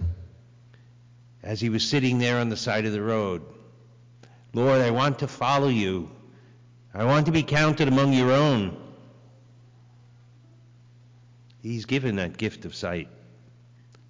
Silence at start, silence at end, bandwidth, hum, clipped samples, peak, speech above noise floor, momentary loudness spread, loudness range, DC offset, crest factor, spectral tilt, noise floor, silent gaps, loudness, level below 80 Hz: 0 s; 1 s; 7.6 kHz; 60 Hz at -50 dBFS; under 0.1%; -14 dBFS; 29 dB; 14 LU; 10 LU; under 0.1%; 12 dB; -6 dB/octave; -53 dBFS; none; -24 LUFS; -48 dBFS